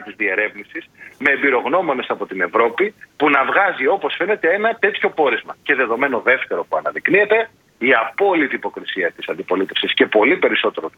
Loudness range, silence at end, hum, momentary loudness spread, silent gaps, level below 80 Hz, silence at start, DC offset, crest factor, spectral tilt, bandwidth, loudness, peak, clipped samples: 1 LU; 0.1 s; none; 8 LU; none; -66 dBFS; 0 s; under 0.1%; 18 dB; -5.5 dB/octave; 7 kHz; -17 LUFS; 0 dBFS; under 0.1%